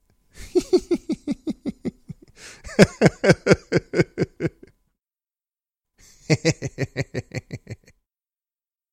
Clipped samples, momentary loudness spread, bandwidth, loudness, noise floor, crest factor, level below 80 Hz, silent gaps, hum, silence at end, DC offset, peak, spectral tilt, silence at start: under 0.1%; 24 LU; 14.5 kHz; -22 LUFS; under -90 dBFS; 24 dB; -48 dBFS; none; none; 1.2 s; under 0.1%; 0 dBFS; -6 dB/octave; 0.4 s